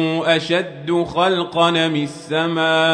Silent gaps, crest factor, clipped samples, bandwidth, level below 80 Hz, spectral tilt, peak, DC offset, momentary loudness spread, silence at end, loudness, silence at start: none; 16 dB; under 0.1%; 10 kHz; -56 dBFS; -5 dB/octave; -2 dBFS; under 0.1%; 6 LU; 0 s; -18 LUFS; 0 s